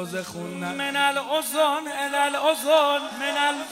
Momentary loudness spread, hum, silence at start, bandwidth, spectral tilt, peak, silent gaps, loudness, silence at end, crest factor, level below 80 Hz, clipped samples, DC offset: 11 LU; none; 0 s; 16 kHz; -2.5 dB/octave; -6 dBFS; none; -23 LUFS; 0 s; 18 dB; -70 dBFS; under 0.1%; under 0.1%